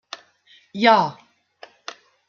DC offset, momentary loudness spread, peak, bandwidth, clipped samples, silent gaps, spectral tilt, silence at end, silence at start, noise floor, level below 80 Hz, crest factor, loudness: under 0.1%; 23 LU; -2 dBFS; 7.2 kHz; under 0.1%; none; -5 dB/octave; 1.15 s; 0.75 s; -56 dBFS; -74 dBFS; 22 dB; -18 LUFS